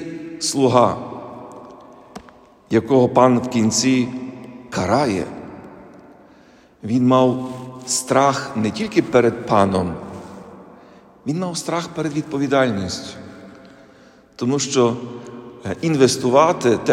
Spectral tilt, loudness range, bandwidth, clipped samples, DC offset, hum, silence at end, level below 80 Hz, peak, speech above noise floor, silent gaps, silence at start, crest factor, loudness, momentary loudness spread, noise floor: -5 dB/octave; 5 LU; 14 kHz; under 0.1%; under 0.1%; none; 0 s; -58 dBFS; 0 dBFS; 32 dB; none; 0 s; 20 dB; -18 LUFS; 21 LU; -49 dBFS